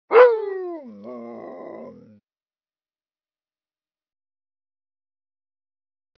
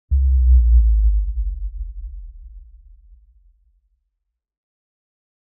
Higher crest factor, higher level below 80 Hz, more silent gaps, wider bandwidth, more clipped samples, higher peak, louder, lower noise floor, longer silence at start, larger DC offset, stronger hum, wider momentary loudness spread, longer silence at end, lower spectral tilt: first, 24 dB vs 14 dB; second, -84 dBFS vs -20 dBFS; neither; first, 5.4 kHz vs 0.2 kHz; neither; first, -2 dBFS vs -6 dBFS; about the same, -18 LUFS vs -18 LUFS; first, under -90 dBFS vs -77 dBFS; about the same, 0.1 s vs 0.1 s; neither; neither; first, 25 LU vs 22 LU; first, 4.3 s vs 2.95 s; second, -2 dB/octave vs -25.5 dB/octave